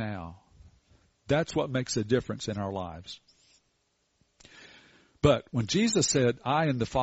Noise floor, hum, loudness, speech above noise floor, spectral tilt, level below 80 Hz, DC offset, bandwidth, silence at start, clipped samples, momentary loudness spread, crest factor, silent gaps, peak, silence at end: -74 dBFS; none; -28 LUFS; 47 dB; -5 dB/octave; -52 dBFS; under 0.1%; 8 kHz; 0 s; under 0.1%; 16 LU; 22 dB; none; -8 dBFS; 0 s